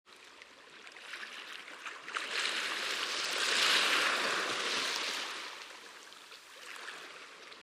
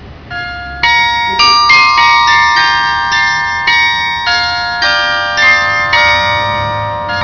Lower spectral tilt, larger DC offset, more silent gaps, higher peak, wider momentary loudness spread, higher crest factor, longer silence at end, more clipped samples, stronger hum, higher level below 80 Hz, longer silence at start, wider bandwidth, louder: second, 1 dB/octave vs -1.5 dB/octave; second, under 0.1% vs 0.4%; neither; second, -16 dBFS vs 0 dBFS; first, 23 LU vs 10 LU; first, 20 dB vs 10 dB; about the same, 0 s vs 0 s; neither; neither; second, -88 dBFS vs -36 dBFS; about the same, 0.1 s vs 0 s; first, 15.5 kHz vs 5.4 kHz; second, -32 LUFS vs -8 LUFS